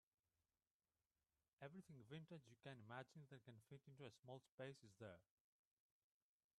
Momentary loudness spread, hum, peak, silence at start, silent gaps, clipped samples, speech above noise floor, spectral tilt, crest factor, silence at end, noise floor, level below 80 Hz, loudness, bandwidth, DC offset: 7 LU; none; -40 dBFS; 1.6 s; 4.19-4.23 s, 4.52-4.58 s; under 0.1%; over 28 dB; -6 dB/octave; 24 dB; 1.35 s; under -90 dBFS; under -90 dBFS; -62 LUFS; 11.5 kHz; under 0.1%